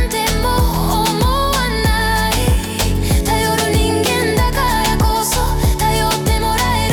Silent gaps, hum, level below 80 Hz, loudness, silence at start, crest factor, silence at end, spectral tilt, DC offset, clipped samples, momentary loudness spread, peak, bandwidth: none; none; -20 dBFS; -16 LUFS; 0 s; 10 dB; 0 s; -4 dB/octave; under 0.1%; under 0.1%; 2 LU; -4 dBFS; over 20 kHz